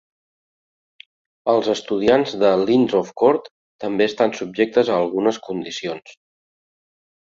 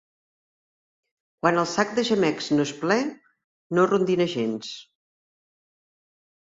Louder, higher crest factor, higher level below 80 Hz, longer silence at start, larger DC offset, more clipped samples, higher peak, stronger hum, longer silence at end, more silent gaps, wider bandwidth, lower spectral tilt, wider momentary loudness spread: first, -19 LUFS vs -24 LUFS; about the same, 20 dB vs 20 dB; first, -60 dBFS vs -68 dBFS; about the same, 1.45 s vs 1.45 s; neither; neither; first, -2 dBFS vs -6 dBFS; neither; second, 1.1 s vs 1.65 s; about the same, 3.51-3.79 s vs 3.44-3.70 s; about the same, 7.8 kHz vs 8 kHz; about the same, -5.5 dB/octave vs -5 dB/octave; about the same, 11 LU vs 10 LU